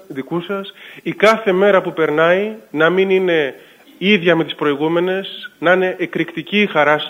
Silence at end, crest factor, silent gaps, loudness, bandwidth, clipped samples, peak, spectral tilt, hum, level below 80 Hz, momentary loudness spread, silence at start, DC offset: 0 s; 16 dB; none; -16 LUFS; 16 kHz; under 0.1%; 0 dBFS; -6 dB/octave; none; -66 dBFS; 11 LU; 0.1 s; under 0.1%